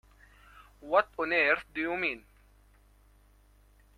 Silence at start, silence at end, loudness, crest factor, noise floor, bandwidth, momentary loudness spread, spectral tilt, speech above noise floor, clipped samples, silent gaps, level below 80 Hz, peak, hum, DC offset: 0.85 s; 1.8 s; -29 LUFS; 24 dB; -61 dBFS; 14.5 kHz; 12 LU; -5 dB/octave; 32 dB; under 0.1%; none; -62 dBFS; -10 dBFS; 50 Hz at -60 dBFS; under 0.1%